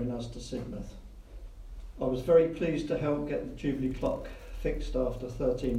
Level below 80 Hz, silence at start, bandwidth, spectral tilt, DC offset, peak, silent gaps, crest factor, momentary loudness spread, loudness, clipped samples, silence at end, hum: -42 dBFS; 0 s; 12.5 kHz; -7.5 dB/octave; under 0.1%; -12 dBFS; none; 20 dB; 24 LU; -31 LUFS; under 0.1%; 0 s; none